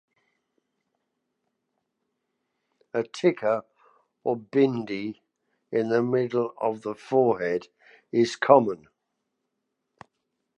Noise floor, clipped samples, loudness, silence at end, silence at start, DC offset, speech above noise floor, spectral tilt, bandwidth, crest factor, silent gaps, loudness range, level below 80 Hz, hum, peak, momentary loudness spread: -80 dBFS; under 0.1%; -25 LUFS; 1.8 s; 2.95 s; under 0.1%; 56 dB; -6.5 dB/octave; 9.2 kHz; 26 dB; none; 7 LU; -74 dBFS; none; -2 dBFS; 13 LU